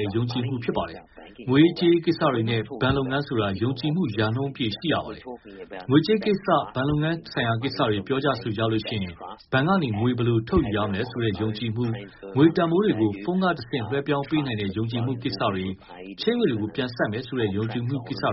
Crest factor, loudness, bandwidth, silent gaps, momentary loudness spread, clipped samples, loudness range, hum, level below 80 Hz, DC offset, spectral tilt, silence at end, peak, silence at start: 18 dB; -25 LUFS; 5.8 kHz; none; 9 LU; under 0.1%; 3 LU; none; -48 dBFS; under 0.1%; -5.5 dB/octave; 0 s; -6 dBFS; 0 s